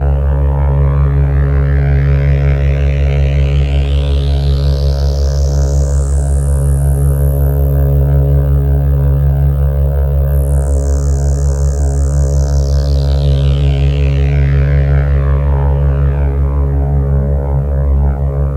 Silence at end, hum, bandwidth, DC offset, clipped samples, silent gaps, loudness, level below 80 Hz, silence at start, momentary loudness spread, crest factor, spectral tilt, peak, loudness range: 0 s; none; 16.5 kHz; under 0.1%; under 0.1%; none; -13 LUFS; -12 dBFS; 0 s; 2 LU; 8 dB; -7.5 dB/octave; -2 dBFS; 1 LU